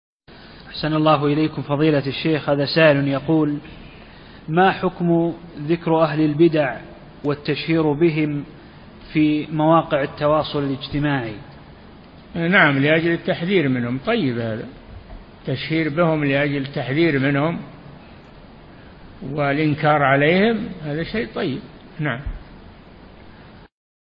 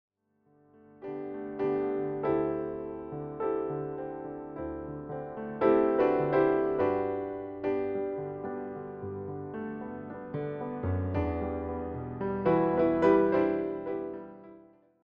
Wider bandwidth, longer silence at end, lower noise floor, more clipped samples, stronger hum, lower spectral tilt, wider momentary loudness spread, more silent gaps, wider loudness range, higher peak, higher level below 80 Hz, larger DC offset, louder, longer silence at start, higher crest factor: about the same, 5.4 kHz vs 5.2 kHz; about the same, 0.5 s vs 0.45 s; second, -44 dBFS vs -69 dBFS; neither; neither; first, -11 dB/octave vs -7.5 dB/octave; about the same, 16 LU vs 14 LU; neither; second, 3 LU vs 8 LU; first, 0 dBFS vs -12 dBFS; first, -46 dBFS vs -54 dBFS; neither; first, -19 LUFS vs -31 LUFS; second, 0.3 s vs 1 s; about the same, 20 dB vs 18 dB